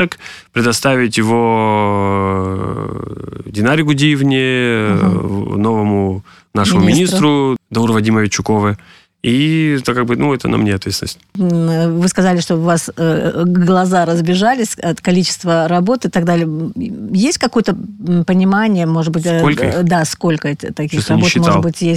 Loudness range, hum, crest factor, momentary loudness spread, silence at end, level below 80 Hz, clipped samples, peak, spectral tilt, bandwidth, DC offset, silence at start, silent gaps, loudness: 2 LU; none; 12 dB; 9 LU; 0 s; -44 dBFS; under 0.1%; -2 dBFS; -5.5 dB/octave; 14 kHz; under 0.1%; 0 s; none; -14 LUFS